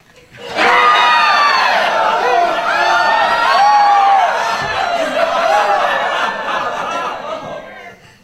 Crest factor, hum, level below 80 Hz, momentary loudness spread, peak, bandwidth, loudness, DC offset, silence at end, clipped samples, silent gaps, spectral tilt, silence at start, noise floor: 14 dB; none; -52 dBFS; 13 LU; 0 dBFS; 14.5 kHz; -12 LUFS; under 0.1%; 0.3 s; under 0.1%; none; -2 dB/octave; 0.35 s; -36 dBFS